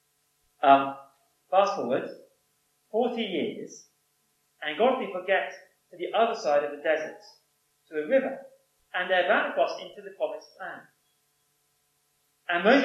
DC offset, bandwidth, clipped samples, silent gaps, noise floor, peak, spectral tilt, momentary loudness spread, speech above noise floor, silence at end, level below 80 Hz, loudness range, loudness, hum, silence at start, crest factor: under 0.1%; 12.5 kHz; under 0.1%; none; -72 dBFS; -6 dBFS; -4.5 dB/octave; 19 LU; 46 dB; 0 s; -88 dBFS; 4 LU; -27 LUFS; none; 0.6 s; 24 dB